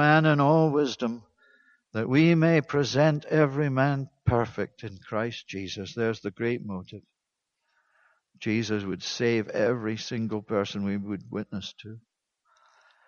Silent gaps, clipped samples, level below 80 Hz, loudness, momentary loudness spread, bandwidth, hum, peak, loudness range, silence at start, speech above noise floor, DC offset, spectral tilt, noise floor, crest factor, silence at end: none; under 0.1%; -58 dBFS; -26 LUFS; 15 LU; 7 kHz; none; -6 dBFS; 9 LU; 0 s; 58 dB; under 0.1%; -6.5 dB/octave; -84 dBFS; 22 dB; 1.1 s